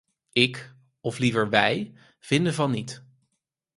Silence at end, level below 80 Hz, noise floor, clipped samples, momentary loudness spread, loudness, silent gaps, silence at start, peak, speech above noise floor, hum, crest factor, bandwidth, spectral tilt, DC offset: 0.8 s; -62 dBFS; -79 dBFS; under 0.1%; 18 LU; -24 LUFS; none; 0.35 s; -2 dBFS; 55 dB; none; 26 dB; 11.5 kHz; -5 dB/octave; under 0.1%